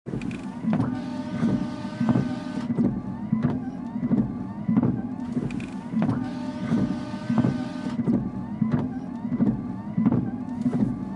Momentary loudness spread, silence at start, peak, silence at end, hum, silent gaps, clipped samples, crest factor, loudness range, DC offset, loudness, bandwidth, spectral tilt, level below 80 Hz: 7 LU; 0.05 s; -8 dBFS; 0 s; none; none; under 0.1%; 18 dB; 1 LU; under 0.1%; -27 LUFS; 10 kHz; -8.5 dB/octave; -50 dBFS